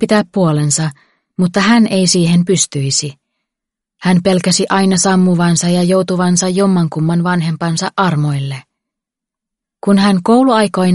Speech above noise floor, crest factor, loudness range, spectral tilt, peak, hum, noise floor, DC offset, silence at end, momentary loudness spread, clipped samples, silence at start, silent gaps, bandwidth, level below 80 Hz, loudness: 71 dB; 14 dB; 4 LU; -5 dB/octave; 0 dBFS; none; -83 dBFS; under 0.1%; 0 s; 7 LU; under 0.1%; 0 s; none; 11.5 kHz; -52 dBFS; -13 LUFS